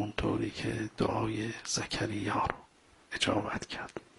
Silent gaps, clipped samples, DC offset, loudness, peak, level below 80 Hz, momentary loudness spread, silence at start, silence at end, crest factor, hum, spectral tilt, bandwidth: none; under 0.1%; under 0.1%; -34 LUFS; -10 dBFS; -54 dBFS; 8 LU; 0 s; 0.15 s; 24 dB; none; -4 dB/octave; 11.5 kHz